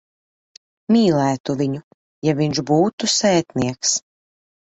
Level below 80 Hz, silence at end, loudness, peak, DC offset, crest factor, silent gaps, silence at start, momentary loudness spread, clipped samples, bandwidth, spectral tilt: -56 dBFS; 0.65 s; -19 LUFS; -4 dBFS; under 0.1%; 16 dB; 1.40-1.44 s, 1.84-2.22 s, 2.93-2.98 s; 0.9 s; 8 LU; under 0.1%; 8.2 kHz; -4.5 dB/octave